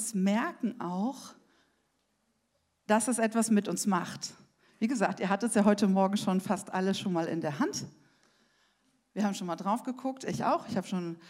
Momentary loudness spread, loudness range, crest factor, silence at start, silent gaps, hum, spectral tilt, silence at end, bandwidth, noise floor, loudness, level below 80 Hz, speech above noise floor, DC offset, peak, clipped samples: 11 LU; 6 LU; 20 dB; 0 s; none; none; -5 dB/octave; 0 s; 15.5 kHz; -76 dBFS; -30 LUFS; -78 dBFS; 46 dB; under 0.1%; -10 dBFS; under 0.1%